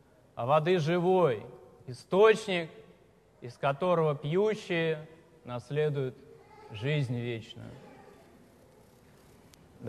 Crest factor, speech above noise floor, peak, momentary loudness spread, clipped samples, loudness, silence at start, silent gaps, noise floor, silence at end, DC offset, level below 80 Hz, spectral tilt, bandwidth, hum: 20 dB; 32 dB; -10 dBFS; 22 LU; under 0.1%; -29 LUFS; 0.35 s; none; -61 dBFS; 0 s; under 0.1%; -68 dBFS; -6.5 dB/octave; 12.5 kHz; none